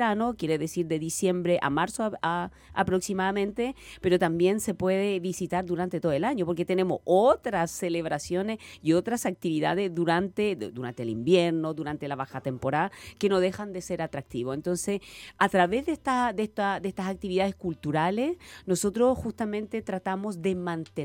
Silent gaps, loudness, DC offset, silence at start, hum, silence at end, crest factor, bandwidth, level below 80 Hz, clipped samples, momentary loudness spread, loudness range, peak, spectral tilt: none; -28 LUFS; under 0.1%; 0 s; none; 0 s; 20 dB; 17.5 kHz; -56 dBFS; under 0.1%; 9 LU; 2 LU; -6 dBFS; -5.5 dB/octave